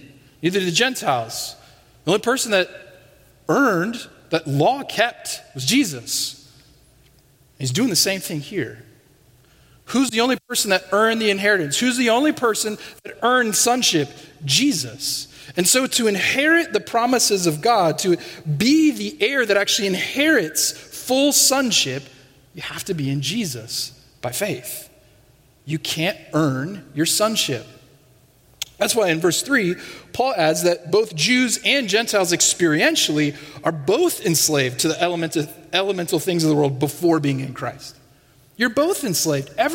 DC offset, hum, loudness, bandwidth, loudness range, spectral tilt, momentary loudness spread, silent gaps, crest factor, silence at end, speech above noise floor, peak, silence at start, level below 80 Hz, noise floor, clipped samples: under 0.1%; none; -19 LUFS; 16.5 kHz; 6 LU; -3 dB/octave; 12 LU; none; 20 dB; 0 s; 35 dB; -2 dBFS; 0.05 s; -60 dBFS; -55 dBFS; under 0.1%